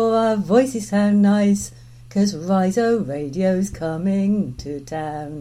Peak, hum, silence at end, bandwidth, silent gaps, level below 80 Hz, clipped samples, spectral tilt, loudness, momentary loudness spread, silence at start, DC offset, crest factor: -4 dBFS; none; 0 s; 13 kHz; none; -48 dBFS; under 0.1%; -6.5 dB/octave; -20 LUFS; 12 LU; 0 s; under 0.1%; 16 dB